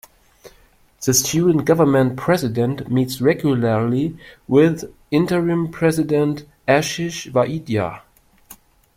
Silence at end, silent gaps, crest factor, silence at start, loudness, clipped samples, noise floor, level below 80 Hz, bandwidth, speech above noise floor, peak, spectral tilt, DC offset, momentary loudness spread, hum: 0.45 s; none; 18 dB; 0.45 s; -19 LUFS; under 0.1%; -53 dBFS; -52 dBFS; 16.5 kHz; 35 dB; -2 dBFS; -5.5 dB/octave; under 0.1%; 8 LU; none